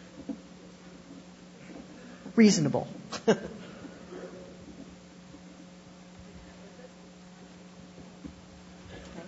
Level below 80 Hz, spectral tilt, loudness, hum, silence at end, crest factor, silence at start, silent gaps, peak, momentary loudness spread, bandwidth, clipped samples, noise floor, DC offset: -62 dBFS; -5.5 dB/octave; -28 LUFS; none; 0 s; 26 dB; 0.05 s; none; -8 dBFS; 22 LU; 7.6 kHz; under 0.1%; -51 dBFS; under 0.1%